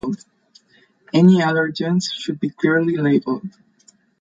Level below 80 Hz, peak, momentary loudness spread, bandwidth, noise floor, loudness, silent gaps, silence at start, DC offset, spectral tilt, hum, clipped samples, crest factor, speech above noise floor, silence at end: -62 dBFS; -4 dBFS; 14 LU; 7.8 kHz; -57 dBFS; -18 LUFS; none; 0.05 s; under 0.1%; -6.5 dB/octave; none; under 0.1%; 16 dB; 40 dB; 0.7 s